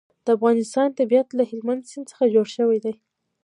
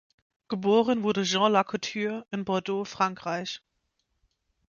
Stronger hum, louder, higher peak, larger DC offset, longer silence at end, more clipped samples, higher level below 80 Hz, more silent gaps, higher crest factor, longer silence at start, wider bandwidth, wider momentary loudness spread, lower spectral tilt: neither; first, -21 LUFS vs -27 LUFS; about the same, -6 dBFS vs -8 dBFS; neither; second, 0.5 s vs 1.2 s; neither; second, -78 dBFS vs -70 dBFS; neither; about the same, 16 dB vs 20 dB; second, 0.25 s vs 0.5 s; first, 11 kHz vs 7.2 kHz; about the same, 10 LU vs 11 LU; about the same, -5.5 dB/octave vs -4.5 dB/octave